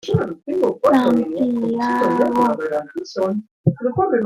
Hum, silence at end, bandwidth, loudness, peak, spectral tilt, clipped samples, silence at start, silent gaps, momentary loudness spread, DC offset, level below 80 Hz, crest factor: none; 0 s; 14.5 kHz; -19 LUFS; -2 dBFS; -8 dB/octave; under 0.1%; 0.05 s; 3.51-3.64 s; 8 LU; under 0.1%; -56 dBFS; 16 dB